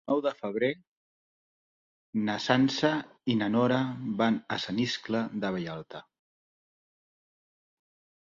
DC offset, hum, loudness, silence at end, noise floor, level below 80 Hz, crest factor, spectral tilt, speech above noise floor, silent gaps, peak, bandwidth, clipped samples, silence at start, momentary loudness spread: under 0.1%; none; -29 LUFS; 2.3 s; under -90 dBFS; -68 dBFS; 22 dB; -5.5 dB/octave; over 61 dB; 0.87-2.13 s; -10 dBFS; 7.6 kHz; under 0.1%; 0.05 s; 11 LU